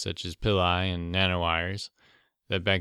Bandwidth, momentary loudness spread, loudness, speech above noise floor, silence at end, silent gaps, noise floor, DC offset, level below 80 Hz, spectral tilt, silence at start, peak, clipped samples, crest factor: 12 kHz; 9 LU; -27 LUFS; 36 dB; 0 s; none; -64 dBFS; under 0.1%; -46 dBFS; -5 dB/octave; 0 s; -10 dBFS; under 0.1%; 18 dB